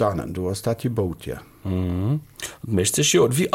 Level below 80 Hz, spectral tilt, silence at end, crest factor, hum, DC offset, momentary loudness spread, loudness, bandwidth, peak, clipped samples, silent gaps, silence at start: -46 dBFS; -4.5 dB/octave; 0 s; 16 dB; none; under 0.1%; 16 LU; -23 LUFS; 17 kHz; -6 dBFS; under 0.1%; none; 0 s